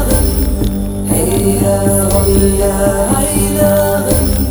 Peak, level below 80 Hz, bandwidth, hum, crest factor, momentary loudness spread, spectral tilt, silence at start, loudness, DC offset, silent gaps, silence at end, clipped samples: 0 dBFS; -18 dBFS; over 20 kHz; none; 12 dB; 4 LU; -5.5 dB/octave; 0 s; -12 LUFS; 0.7%; none; 0 s; under 0.1%